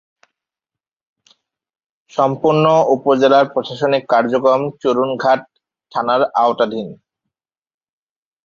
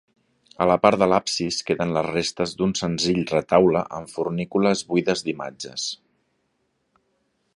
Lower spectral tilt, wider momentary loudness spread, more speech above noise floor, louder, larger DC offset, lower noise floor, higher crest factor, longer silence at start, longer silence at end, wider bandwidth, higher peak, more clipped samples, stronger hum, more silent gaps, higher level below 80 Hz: first, -6.5 dB/octave vs -4.5 dB/octave; second, 8 LU vs 11 LU; first, 73 dB vs 50 dB; first, -16 LUFS vs -22 LUFS; neither; first, -88 dBFS vs -71 dBFS; second, 16 dB vs 22 dB; first, 2.15 s vs 0.6 s; about the same, 1.5 s vs 1.6 s; second, 7.2 kHz vs 11.5 kHz; about the same, -2 dBFS vs 0 dBFS; neither; neither; neither; second, -64 dBFS vs -54 dBFS